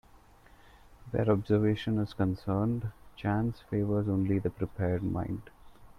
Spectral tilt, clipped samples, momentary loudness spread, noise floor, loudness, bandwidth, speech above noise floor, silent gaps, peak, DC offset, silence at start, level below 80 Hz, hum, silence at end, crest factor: -9.5 dB/octave; under 0.1%; 9 LU; -57 dBFS; -31 LUFS; 6.2 kHz; 28 dB; none; -12 dBFS; under 0.1%; 1 s; -54 dBFS; none; 0.1 s; 18 dB